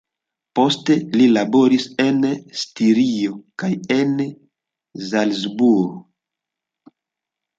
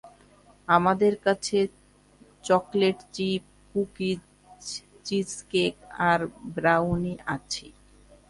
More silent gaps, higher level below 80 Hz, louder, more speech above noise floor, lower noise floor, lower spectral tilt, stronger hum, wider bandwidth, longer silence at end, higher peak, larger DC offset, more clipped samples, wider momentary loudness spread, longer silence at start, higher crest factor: neither; second, -66 dBFS vs -56 dBFS; first, -18 LUFS vs -26 LUFS; first, 67 dB vs 31 dB; first, -85 dBFS vs -57 dBFS; about the same, -5.5 dB/octave vs -5 dB/octave; second, none vs 50 Hz at -50 dBFS; second, 7.8 kHz vs 11.5 kHz; first, 1.55 s vs 0.6 s; about the same, -4 dBFS vs -6 dBFS; neither; neither; about the same, 11 LU vs 13 LU; first, 0.55 s vs 0.05 s; second, 16 dB vs 22 dB